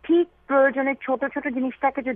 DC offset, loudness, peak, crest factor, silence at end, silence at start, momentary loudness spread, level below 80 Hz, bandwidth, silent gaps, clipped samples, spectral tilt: under 0.1%; -23 LUFS; -8 dBFS; 14 dB; 0 s; 0.05 s; 7 LU; -60 dBFS; 3.7 kHz; none; under 0.1%; -8.5 dB/octave